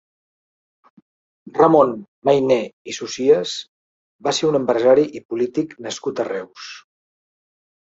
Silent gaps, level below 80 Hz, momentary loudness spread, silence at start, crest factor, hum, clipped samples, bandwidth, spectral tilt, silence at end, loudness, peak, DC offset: 2.08-2.22 s, 2.73-2.85 s, 3.68-4.19 s, 5.25-5.29 s; -64 dBFS; 15 LU; 1.55 s; 20 dB; none; under 0.1%; 8 kHz; -5 dB/octave; 1.05 s; -19 LUFS; -2 dBFS; under 0.1%